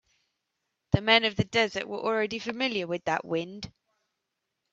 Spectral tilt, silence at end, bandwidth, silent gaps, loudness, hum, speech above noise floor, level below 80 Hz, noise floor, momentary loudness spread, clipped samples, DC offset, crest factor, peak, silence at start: -5 dB/octave; 1.05 s; 8.2 kHz; none; -27 LUFS; none; 55 dB; -54 dBFS; -83 dBFS; 11 LU; under 0.1%; under 0.1%; 24 dB; -4 dBFS; 0.95 s